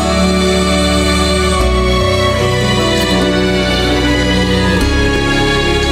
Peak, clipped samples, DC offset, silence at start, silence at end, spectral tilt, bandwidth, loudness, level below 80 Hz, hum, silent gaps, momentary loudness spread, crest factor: -2 dBFS; under 0.1%; under 0.1%; 0 s; 0 s; -4.5 dB/octave; 16 kHz; -12 LUFS; -20 dBFS; none; none; 1 LU; 10 dB